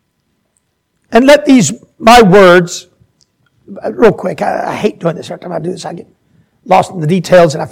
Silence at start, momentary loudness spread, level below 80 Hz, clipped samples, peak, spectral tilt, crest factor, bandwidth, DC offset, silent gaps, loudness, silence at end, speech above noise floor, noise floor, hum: 1.1 s; 18 LU; -40 dBFS; 2%; 0 dBFS; -5 dB/octave; 10 dB; 19 kHz; under 0.1%; none; -9 LUFS; 0.05 s; 54 dB; -63 dBFS; none